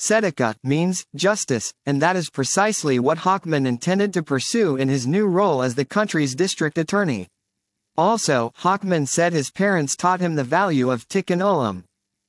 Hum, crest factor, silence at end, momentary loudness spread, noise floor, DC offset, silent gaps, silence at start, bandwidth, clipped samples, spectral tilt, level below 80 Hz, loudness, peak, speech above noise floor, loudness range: none; 16 dB; 0.5 s; 4 LU; -78 dBFS; under 0.1%; none; 0 s; 12 kHz; under 0.1%; -4.5 dB/octave; -70 dBFS; -21 LUFS; -4 dBFS; 58 dB; 2 LU